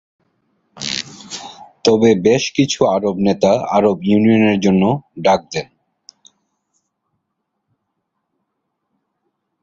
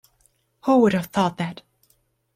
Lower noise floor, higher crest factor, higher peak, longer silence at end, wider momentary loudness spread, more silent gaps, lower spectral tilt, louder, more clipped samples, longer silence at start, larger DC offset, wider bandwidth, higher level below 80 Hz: first, -74 dBFS vs -66 dBFS; about the same, 18 dB vs 16 dB; first, 0 dBFS vs -6 dBFS; first, 4 s vs 0.8 s; about the same, 15 LU vs 13 LU; neither; about the same, -5.5 dB/octave vs -6.5 dB/octave; first, -15 LUFS vs -21 LUFS; neither; about the same, 0.75 s vs 0.65 s; neither; second, 7.8 kHz vs 15.5 kHz; first, -52 dBFS vs -60 dBFS